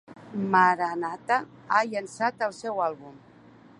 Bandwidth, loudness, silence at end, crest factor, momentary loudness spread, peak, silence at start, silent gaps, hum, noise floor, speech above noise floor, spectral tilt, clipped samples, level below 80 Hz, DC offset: 11.5 kHz; -26 LUFS; 0.6 s; 20 dB; 11 LU; -6 dBFS; 0.1 s; none; none; -52 dBFS; 26 dB; -5 dB/octave; under 0.1%; -74 dBFS; under 0.1%